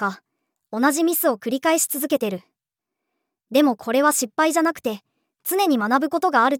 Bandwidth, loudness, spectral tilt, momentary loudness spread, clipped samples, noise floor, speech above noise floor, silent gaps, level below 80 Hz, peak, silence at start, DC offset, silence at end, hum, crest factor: over 20 kHz; -20 LUFS; -3 dB/octave; 10 LU; under 0.1%; -85 dBFS; 65 dB; none; -78 dBFS; -4 dBFS; 0 s; under 0.1%; 0 s; none; 16 dB